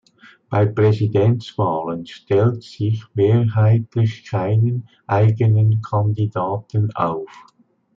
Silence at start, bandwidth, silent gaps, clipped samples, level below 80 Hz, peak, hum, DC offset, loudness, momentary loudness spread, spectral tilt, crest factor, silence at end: 0.5 s; 6 kHz; none; under 0.1%; -58 dBFS; -4 dBFS; none; under 0.1%; -19 LUFS; 8 LU; -9.5 dB/octave; 14 dB; 0.55 s